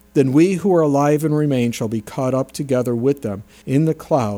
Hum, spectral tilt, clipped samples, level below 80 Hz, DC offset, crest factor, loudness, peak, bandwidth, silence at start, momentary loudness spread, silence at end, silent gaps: none; -7.5 dB/octave; under 0.1%; -54 dBFS; under 0.1%; 14 dB; -18 LUFS; -2 dBFS; 18 kHz; 0.15 s; 9 LU; 0 s; none